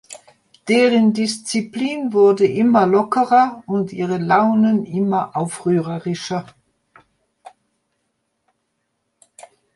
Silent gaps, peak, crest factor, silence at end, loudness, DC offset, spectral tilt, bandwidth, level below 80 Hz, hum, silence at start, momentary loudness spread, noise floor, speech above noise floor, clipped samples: none; -2 dBFS; 16 dB; 3.35 s; -17 LUFS; under 0.1%; -6 dB/octave; 11.5 kHz; -66 dBFS; none; 0.1 s; 10 LU; -72 dBFS; 55 dB; under 0.1%